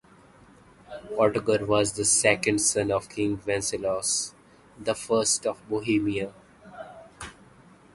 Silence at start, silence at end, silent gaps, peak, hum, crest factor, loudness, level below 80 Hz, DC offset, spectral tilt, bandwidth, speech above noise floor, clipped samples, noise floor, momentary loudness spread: 0.9 s; 0.6 s; none; -4 dBFS; none; 22 dB; -25 LUFS; -56 dBFS; under 0.1%; -3 dB/octave; 12 kHz; 29 dB; under 0.1%; -54 dBFS; 21 LU